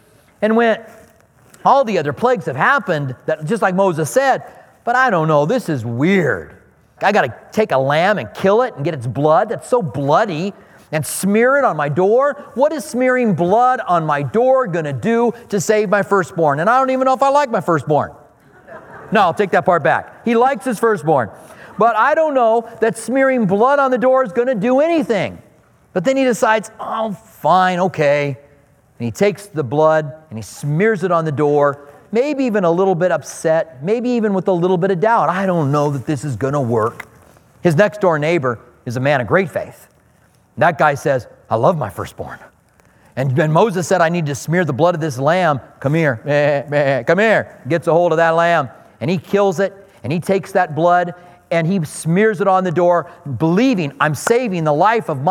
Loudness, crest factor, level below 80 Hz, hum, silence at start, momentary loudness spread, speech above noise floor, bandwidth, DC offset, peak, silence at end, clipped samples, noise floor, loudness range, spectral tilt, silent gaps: -16 LUFS; 16 dB; -58 dBFS; none; 0.4 s; 9 LU; 38 dB; 17.5 kHz; under 0.1%; 0 dBFS; 0 s; under 0.1%; -53 dBFS; 3 LU; -6 dB/octave; none